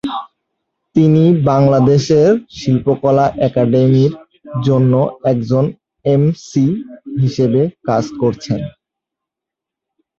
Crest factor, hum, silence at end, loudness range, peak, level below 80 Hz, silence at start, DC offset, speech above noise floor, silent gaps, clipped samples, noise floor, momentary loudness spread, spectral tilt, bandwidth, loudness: 14 dB; none; 1.5 s; 6 LU; 0 dBFS; -48 dBFS; 0.05 s; under 0.1%; 71 dB; none; under 0.1%; -84 dBFS; 11 LU; -8.5 dB/octave; 7.4 kHz; -14 LUFS